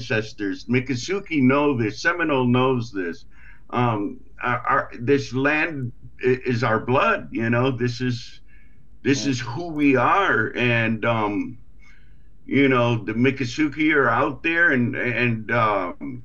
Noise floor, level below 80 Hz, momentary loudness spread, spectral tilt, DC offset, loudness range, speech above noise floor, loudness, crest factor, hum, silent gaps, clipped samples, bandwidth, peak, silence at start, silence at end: -51 dBFS; -50 dBFS; 11 LU; -6 dB/octave; 1%; 3 LU; 30 dB; -21 LUFS; 16 dB; none; none; under 0.1%; 7.6 kHz; -6 dBFS; 0 s; 0 s